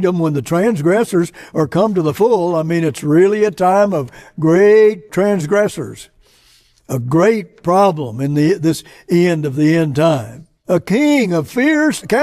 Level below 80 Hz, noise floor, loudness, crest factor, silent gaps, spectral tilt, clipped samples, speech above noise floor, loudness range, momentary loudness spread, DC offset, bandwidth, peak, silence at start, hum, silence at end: -52 dBFS; -52 dBFS; -15 LUFS; 14 dB; none; -6.5 dB/octave; under 0.1%; 38 dB; 3 LU; 9 LU; under 0.1%; 14.5 kHz; -2 dBFS; 0 s; none; 0 s